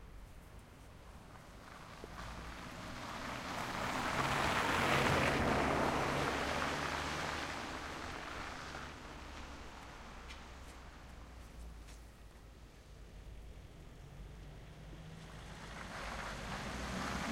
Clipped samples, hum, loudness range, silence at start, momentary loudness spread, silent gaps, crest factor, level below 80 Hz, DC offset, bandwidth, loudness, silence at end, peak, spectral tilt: under 0.1%; none; 21 LU; 0 s; 23 LU; none; 24 dB; -54 dBFS; under 0.1%; 16 kHz; -38 LUFS; 0 s; -18 dBFS; -4 dB/octave